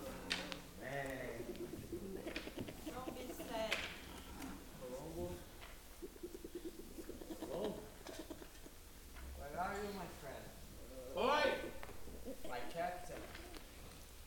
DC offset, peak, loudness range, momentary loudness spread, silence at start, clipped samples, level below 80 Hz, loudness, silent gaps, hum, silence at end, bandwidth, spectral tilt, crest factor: under 0.1%; -22 dBFS; 8 LU; 14 LU; 0 s; under 0.1%; -58 dBFS; -46 LUFS; none; none; 0 s; 17.5 kHz; -4 dB/octave; 24 dB